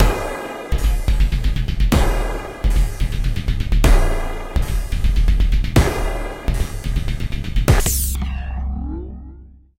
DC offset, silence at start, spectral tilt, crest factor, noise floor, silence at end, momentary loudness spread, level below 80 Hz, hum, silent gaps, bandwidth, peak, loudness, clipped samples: 0.5%; 0 s; -5 dB/octave; 18 dB; -41 dBFS; 0.3 s; 9 LU; -18 dBFS; none; none; 16.5 kHz; 0 dBFS; -21 LUFS; under 0.1%